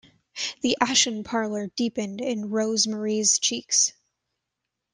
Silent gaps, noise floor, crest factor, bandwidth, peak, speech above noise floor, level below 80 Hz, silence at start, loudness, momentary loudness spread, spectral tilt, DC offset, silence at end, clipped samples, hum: none; -83 dBFS; 22 dB; 11 kHz; -4 dBFS; 58 dB; -68 dBFS; 0.35 s; -24 LUFS; 9 LU; -1.5 dB/octave; under 0.1%; 1.05 s; under 0.1%; none